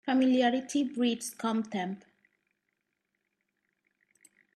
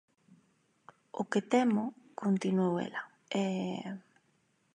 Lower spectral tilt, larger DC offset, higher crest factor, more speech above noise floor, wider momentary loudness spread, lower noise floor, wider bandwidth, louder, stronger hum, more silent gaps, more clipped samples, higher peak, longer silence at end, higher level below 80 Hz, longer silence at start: second, -4.5 dB/octave vs -6.5 dB/octave; neither; about the same, 18 dB vs 20 dB; first, 53 dB vs 42 dB; second, 11 LU vs 14 LU; first, -82 dBFS vs -73 dBFS; first, 13.5 kHz vs 10 kHz; first, -30 LUFS vs -33 LUFS; neither; neither; neither; about the same, -14 dBFS vs -14 dBFS; first, 2.6 s vs 0.75 s; about the same, -80 dBFS vs -84 dBFS; second, 0.05 s vs 1.15 s